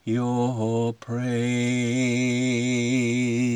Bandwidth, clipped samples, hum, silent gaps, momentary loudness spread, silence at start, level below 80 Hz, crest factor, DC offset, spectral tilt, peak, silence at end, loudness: 11 kHz; under 0.1%; none; none; 4 LU; 0.05 s; -70 dBFS; 12 dB; under 0.1%; -5.5 dB/octave; -12 dBFS; 0 s; -24 LUFS